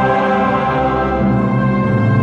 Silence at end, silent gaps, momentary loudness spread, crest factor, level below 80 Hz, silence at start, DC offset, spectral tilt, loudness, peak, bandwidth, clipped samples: 0 s; none; 2 LU; 12 dB; -32 dBFS; 0 s; under 0.1%; -9 dB/octave; -15 LUFS; -2 dBFS; 7 kHz; under 0.1%